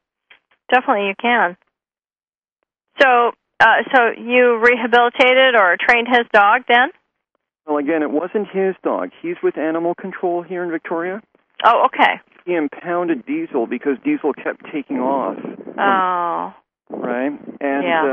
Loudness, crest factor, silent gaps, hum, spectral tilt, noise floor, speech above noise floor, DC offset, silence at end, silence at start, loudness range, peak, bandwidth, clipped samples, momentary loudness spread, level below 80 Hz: -17 LUFS; 18 dB; 2.52-2.56 s; none; -5.5 dB/octave; under -90 dBFS; over 73 dB; under 0.1%; 0 s; 0.7 s; 8 LU; 0 dBFS; 8 kHz; under 0.1%; 13 LU; -62 dBFS